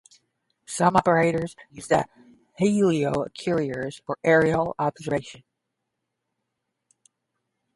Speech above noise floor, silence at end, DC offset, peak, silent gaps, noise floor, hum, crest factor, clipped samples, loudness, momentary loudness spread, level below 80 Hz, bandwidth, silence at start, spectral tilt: 58 dB; 2.45 s; under 0.1%; -4 dBFS; none; -81 dBFS; none; 22 dB; under 0.1%; -23 LUFS; 14 LU; -56 dBFS; 11.5 kHz; 0.7 s; -6 dB/octave